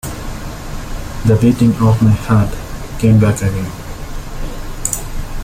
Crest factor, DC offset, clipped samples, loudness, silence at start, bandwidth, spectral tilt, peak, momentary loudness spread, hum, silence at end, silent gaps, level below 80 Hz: 14 dB; under 0.1%; under 0.1%; -14 LUFS; 0.05 s; 16.5 kHz; -6.5 dB/octave; 0 dBFS; 17 LU; none; 0 s; none; -26 dBFS